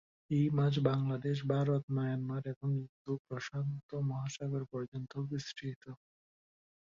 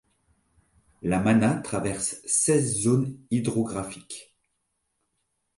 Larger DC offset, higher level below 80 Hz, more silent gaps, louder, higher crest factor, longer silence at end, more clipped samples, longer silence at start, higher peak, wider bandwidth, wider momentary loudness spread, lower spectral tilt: neither; second, -70 dBFS vs -56 dBFS; first, 1.83-1.88 s, 2.56-2.61 s, 2.89-3.05 s, 3.19-3.25 s, 3.83-3.89 s, 4.88-4.92 s, 5.76-5.81 s vs none; second, -36 LUFS vs -25 LUFS; about the same, 20 dB vs 20 dB; second, 0.9 s vs 1.35 s; neither; second, 0.3 s vs 1.05 s; second, -16 dBFS vs -8 dBFS; second, 7.4 kHz vs 11.5 kHz; second, 11 LU vs 14 LU; first, -7.5 dB/octave vs -5 dB/octave